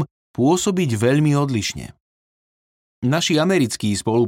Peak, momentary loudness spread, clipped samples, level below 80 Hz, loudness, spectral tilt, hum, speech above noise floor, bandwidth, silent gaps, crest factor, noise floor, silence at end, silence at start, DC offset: -6 dBFS; 9 LU; under 0.1%; -54 dBFS; -19 LUFS; -5 dB/octave; none; over 72 dB; 16.5 kHz; 0.11-0.34 s, 2.00-3.02 s; 14 dB; under -90 dBFS; 0 s; 0 s; under 0.1%